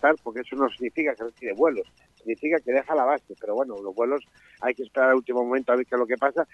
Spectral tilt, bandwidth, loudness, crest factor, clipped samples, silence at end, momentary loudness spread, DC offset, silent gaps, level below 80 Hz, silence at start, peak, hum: -6 dB/octave; 8 kHz; -25 LUFS; 18 dB; under 0.1%; 0.1 s; 10 LU; under 0.1%; none; -70 dBFS; 0.05 s; -8 dBFS; none